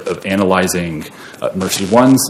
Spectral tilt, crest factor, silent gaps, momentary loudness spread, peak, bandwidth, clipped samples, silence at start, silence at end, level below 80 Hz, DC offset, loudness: -4.5 dB/octave; 14 dB; none; 13 LU; 0 dBFS; 17 kHz; 0.2%; 0 s; 0 s; -48 dBFS; under 0.1%; -15 LUFS